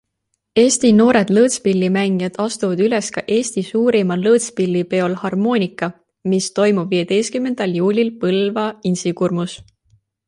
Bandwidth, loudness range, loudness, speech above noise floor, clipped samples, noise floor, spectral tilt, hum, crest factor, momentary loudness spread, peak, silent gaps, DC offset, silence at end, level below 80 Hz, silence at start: 11.5 kHz; 3 LU; -17 LUFS; 57 dB; under 0.1%; -73 dBFS; -5 dB/octave; none; 16 dB; 8 LU; -2 dBFS; none; under 0.1%; 0.7 s; -58 dBFS; 0.55 s